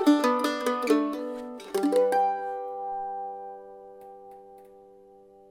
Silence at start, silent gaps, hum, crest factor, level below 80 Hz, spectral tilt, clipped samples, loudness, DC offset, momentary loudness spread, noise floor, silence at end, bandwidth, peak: 0 s; none; none; 18 dB; -72 dBFS; -4 dB/octave; under 0.1%; -27 LUFS; under 0.1%; 24 LU; -53 dBFS; 0.7 s; 16.5 kHz; -10 dBFS